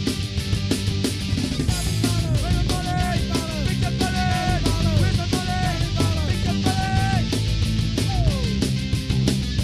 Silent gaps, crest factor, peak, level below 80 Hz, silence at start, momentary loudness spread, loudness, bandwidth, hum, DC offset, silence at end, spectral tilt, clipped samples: none; 16 dB; -6 dBFS; -28 dBFS; 0 s; 3 LU; -22 LUFS; 15 kHz; none; under 0.1%; 0 s; -5 dB/octave; under 0.1%